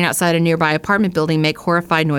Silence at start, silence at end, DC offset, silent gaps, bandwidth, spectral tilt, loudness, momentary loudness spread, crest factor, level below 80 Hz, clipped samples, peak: 0 s; 0 s; under 0.1%; none; 17.5 kHz; -5 dB/octave; -16 LUFS; 2 LU; 14 dB; -50 dBFS; under 0.1%; -2 dBFS